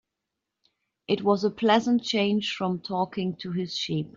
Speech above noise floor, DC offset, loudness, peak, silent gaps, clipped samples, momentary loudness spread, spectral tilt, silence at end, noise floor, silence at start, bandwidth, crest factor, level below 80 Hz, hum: 59 dB; under 0.1%; -26 LUFS; -8 dBFS; none; under 0.1%; 8 LU; -5.5 dB/octave; 0.05 s; -85 dBFS; 1.1 s; 7.6 kHz; 18 dB; -68 dBFS; none